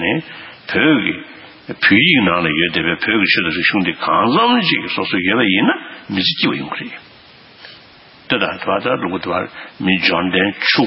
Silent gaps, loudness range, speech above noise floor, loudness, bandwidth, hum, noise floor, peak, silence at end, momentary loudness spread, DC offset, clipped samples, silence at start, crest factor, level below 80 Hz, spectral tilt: none; 7 LU; 28 dB; -15 LUFS; 5.8 kHz; none; -43 dBFS; 0 dBFS; 0 s; 13 LU; under 0.1%; under 0.1%; 0 s; 16 dB; -50 dBFS; -8.5 dB/octave